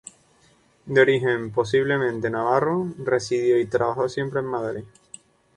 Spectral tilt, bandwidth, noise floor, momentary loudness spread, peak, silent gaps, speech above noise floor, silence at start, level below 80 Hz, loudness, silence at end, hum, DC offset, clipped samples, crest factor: -6 dB/octave; 10.5 kHz; -59 dBFS; 9 LU; -4 dBFS; none; 37 dB; 0.85 s; -60 dBFS; -22 LUFS; 0.7 s; none; under 0.1%; under 0.1%; 20 dB